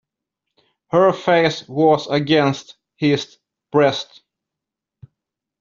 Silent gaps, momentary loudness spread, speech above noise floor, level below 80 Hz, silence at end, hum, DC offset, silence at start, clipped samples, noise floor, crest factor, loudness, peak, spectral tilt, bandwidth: none; 11 LU; 68 dB; -60 dBFS; 1.55 s; none; under 0.1%; 0.95 s; under 0.1%; -85 dBFS; 18 dB; -18 LUFS; -2 dBFS; -6 dB/octave; 7.6 kHz